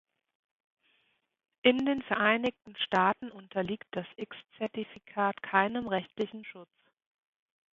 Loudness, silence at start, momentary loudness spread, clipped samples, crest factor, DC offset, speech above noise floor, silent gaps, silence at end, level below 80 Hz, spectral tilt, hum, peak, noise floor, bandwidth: -31 LUFS; 1.65 s; 14 LU; under 0.1%; 24 dB; under 0.1%; 43 dB; none; 1.1 s; -70 dBFS; -6.5 dB/octave; none; -8 dBFS; -74 dBFS; 7.6 kHz